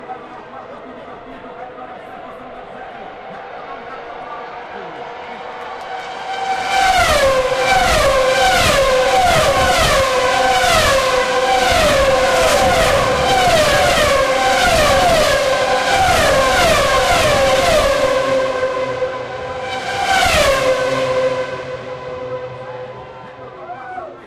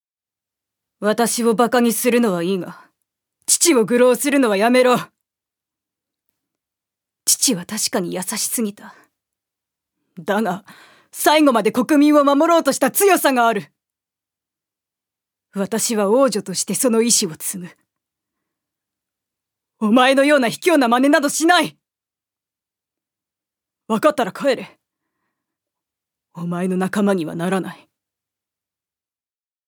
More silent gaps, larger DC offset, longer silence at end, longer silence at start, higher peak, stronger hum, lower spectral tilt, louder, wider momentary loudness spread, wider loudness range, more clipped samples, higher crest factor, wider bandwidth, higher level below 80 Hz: neither; neither; second, 0 s vs 1.95 s; second, 0 s vs 1 s; about the same, -2 dBFS vs 0 dBFS; neither; about the same, -3 dB/octave vs -3.5 dB/octave; first, -14 LUFS vs -17 LUFS; first, 20 LU vs 12 LU; first, 18 LU vs 8 LU; neither; second, 14 dB vs 20 dB; second, 16 kHz vs over 20 kHz; first, -32 dBFS vs -76 dBFS